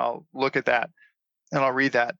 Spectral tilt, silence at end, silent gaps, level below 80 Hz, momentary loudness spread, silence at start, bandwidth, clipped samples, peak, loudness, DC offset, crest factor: -5.5 dB/octave; 0.05 s; none; -68 dBFS; 8 LU; 0 s; 7.6 kHz; under 0.1%; -8 dBFS; -24 LUFS; under 0.1%; 18 dB